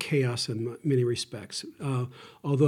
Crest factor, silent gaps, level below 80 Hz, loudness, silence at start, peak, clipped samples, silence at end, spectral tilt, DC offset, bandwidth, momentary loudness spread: 18 dB; none; -72 dBFS; -30 LUFS; 0 s; -10 dBFS; under 0.1%; 0 s; -6 dB/octave; under 0.1%; 14 kHz; 10 LU